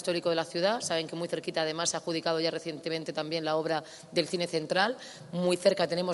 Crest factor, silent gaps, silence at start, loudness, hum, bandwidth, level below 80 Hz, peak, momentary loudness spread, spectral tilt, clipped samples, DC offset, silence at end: 20 dB; none; 0 s; -30 LUFS; none; 11.5 kHz; -76 dBFS; -10 dBFS; 8 LU; -3.5 dB/octave; under 0.1%; under 0.1%; 0 s